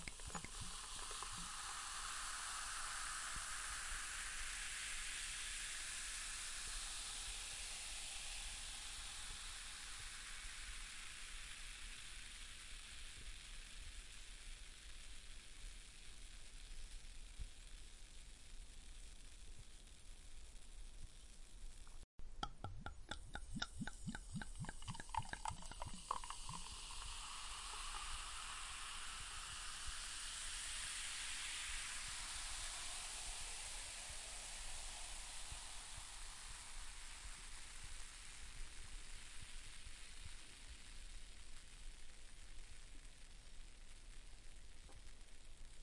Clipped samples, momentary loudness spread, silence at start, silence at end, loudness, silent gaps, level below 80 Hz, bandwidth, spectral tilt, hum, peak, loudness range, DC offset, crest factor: under 0.1%; 16 LU; 0 s; 0 s; -49 LUFS; 22.04-22.18 s; -56 dBFS; 11.5 kHz; -1 dB/octave; none; -24 dBFS; 14 LU; under 0.1%; 26 dB